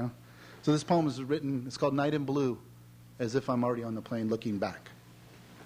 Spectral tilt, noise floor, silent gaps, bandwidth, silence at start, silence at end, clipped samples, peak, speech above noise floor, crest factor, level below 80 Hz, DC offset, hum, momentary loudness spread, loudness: -6.5 dB/octave; -54 dBFS; none; 16 kHz; 0 s; 0 s; under 0.1%; -14 dBFS; 23 dB; 18 dB; -68 dBFS; under 0.1%; none; 12 LU; -32 LUFS